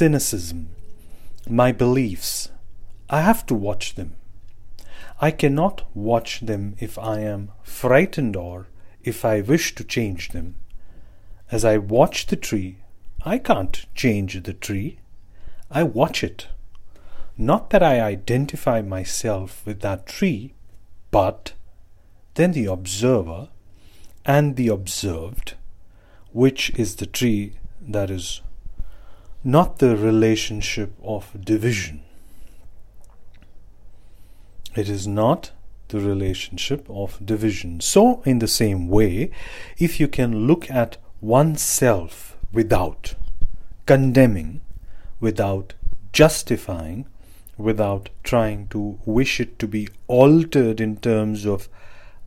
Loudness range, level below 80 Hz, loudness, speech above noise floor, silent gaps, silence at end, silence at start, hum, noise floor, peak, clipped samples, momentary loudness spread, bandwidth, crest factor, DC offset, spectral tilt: 6 LU; -36 dBFS; -21 LUFS; 26 dB; none; 0 s; 0 s; none; -46 dBFS; 0 dBFS; under 0.1%; 18 LU; 16 kHz; 22 dB; under 0.1%; -5.5 dB/octave